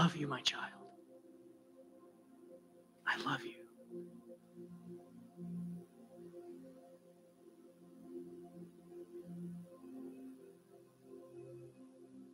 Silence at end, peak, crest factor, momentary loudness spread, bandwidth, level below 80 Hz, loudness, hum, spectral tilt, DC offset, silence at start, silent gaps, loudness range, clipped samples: 0 s; -20 dBFS; 26 dB; 24 LU; 15.5 kHz; -84 dBFS; -45 LUFS; none; -4.5 dB/octave; under 0.1%; 0 s; none; 10 LU; under 0.1%